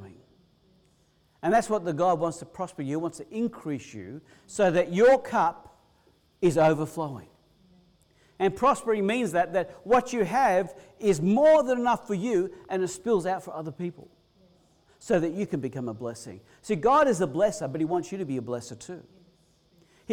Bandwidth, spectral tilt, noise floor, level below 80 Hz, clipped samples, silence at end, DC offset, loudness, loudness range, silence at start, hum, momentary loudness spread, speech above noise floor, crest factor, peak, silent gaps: 16.5 kHz; -6 dB/octave; -65 dBFS; -60 dBFS; under 0.1%; 0 s; under 0.1%; -26 LUFS; 7 LU; 0 s; none; 16 LU; 39 dB; 14 dB; -12 dBFS; none